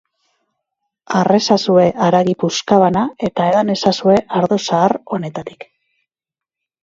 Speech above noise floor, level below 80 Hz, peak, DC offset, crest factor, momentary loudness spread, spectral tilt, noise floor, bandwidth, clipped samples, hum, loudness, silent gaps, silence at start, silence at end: 73 dB; -54 dBFS; 0 dBFS; under 0.1%; 16 dB; 9 LU; -5.5 dB/octave; -88 dBFS; 7.8 kHz; under 0.1%; none; -15 LUFS; none; 1.1 s; 1.2 s